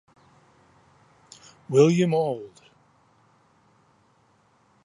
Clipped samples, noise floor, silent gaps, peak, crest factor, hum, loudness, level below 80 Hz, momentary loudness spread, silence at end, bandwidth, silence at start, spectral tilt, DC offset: under 0.1%; -63 dBFS; none; -6 dBFS; 22 dB; none; -22 LUFS; -72 dBFS; 26 LU; 2.4 s; 11.5 kHz; 1.7 s; -7 dB/octave; under 0.1%